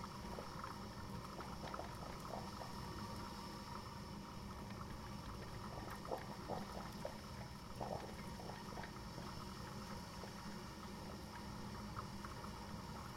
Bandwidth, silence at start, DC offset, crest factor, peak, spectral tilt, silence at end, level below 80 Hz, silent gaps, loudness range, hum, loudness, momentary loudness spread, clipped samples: 16 kHz; 0 s; under 0.1%; 20 dB; -30 dBFS; -5 dB/octave; 0 s; -60 dBFS; none; 1 LU; none; -50 LUFS; 3 LU; under 0.1%